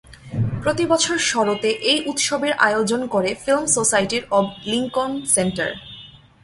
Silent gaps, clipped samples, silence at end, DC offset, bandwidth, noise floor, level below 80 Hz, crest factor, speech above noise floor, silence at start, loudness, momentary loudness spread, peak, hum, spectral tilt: none; under 0.1%; 0.35 s; under 0.1%; 11.5 kHz; -43 dBFS; -50 dBFS; 20 dB; 23 dB; 0.1 s; -19 LUFS; 8 LU; 0 dBFS; none; -3 dB/octave